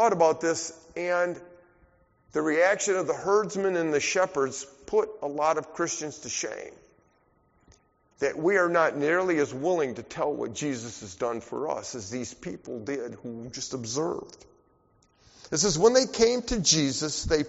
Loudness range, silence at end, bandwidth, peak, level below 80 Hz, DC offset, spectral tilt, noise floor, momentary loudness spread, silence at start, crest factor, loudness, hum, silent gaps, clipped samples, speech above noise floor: 8 LU; 0 s; 8 kHz; -8 dBFS; -52 dBFS; under 0.1%; -3 dB/octave; -66 dBFS; 14 LU; 0 s; 20 dB; -27 LUFS; none; none; under 0.1%; 39 dB